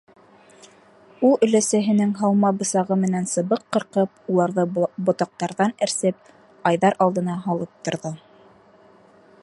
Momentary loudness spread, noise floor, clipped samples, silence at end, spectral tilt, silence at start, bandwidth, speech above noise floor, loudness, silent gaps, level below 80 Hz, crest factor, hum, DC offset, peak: 9 LU; -52 dBFS; under 0.1%; 1.25 s; -5.5 dB/octave; 1.2 s; 11.5 kHz; 31 dB; -21 LUFS; none; -70 dBFS; 18 dB; none; under 0.1%; -4 dBFS